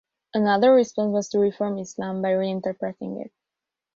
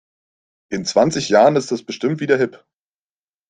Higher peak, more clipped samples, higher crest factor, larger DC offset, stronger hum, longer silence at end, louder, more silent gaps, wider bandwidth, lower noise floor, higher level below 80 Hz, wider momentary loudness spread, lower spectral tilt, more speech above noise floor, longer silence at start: second, -8 dBFS vs -2 dBFS; neither; about the same, 16 dB vs 18 dB; neither; neither; second, 0.7 s vs 0.95 s; second, -23 LUFS vs -18 LUFS; neither; second, 7.6 kHz vs 9.6 kHz; about the same, -87 dBFS vs under -90 dBFS; second, -68 dBFS vs -60 dBFS; first, 15 LU vs 11 LU; about the same, -6 dB/octave vs -5 dB/octave; second, 65 dB vs over 73 dB; second, 0.35 s vs 0.7 s